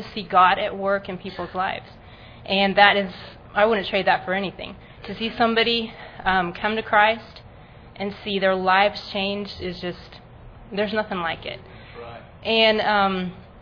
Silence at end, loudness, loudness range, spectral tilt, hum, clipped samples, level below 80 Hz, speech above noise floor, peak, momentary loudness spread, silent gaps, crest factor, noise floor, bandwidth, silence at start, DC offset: 0 s; -21 LUFS; 4 LU; -6.5 dB/octave; none; under 0.1%; -50 dBFS; 23 dB; 0 dBFS; 19 LU; none; 24 dB; -45 dBFS; 5.4 kHz; 0 s; under 0.1%